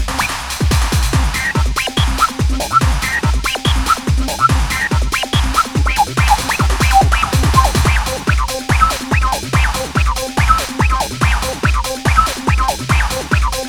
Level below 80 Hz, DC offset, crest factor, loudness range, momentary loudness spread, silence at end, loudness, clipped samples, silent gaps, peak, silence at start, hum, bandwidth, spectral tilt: -18 dBFS; under 0.1%; 14 dB; 2 LU; 4 LU; 0 s; -15 LUFS; under 0.1%; none; 0 dBFS; 0 s; none; 19.5 kHz; -4 dB/octave